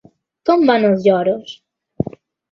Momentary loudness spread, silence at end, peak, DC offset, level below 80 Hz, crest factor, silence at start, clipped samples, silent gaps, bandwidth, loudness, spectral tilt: 13 LU; 0.4 s; -2 dBFS; under 0.1%; -52 dBFS; 16 dB; 0.45 s; under 0.1%; none; 7 kHz; -16 LUFS; -7.5 dB/octave